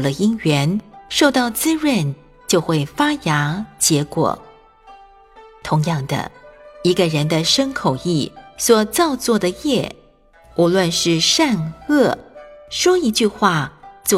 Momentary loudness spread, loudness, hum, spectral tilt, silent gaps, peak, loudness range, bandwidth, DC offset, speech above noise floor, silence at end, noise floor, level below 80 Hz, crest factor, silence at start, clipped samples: 10 LU; -18 LUFS; none; -4 dB/octave; none; 0 dBFS; 4 LU; 16.5 kHz; under 0.1%; 32 dB; 0 s; -50 dBFS; -50 dBFS; 18 dB; 0 s; under 0.1%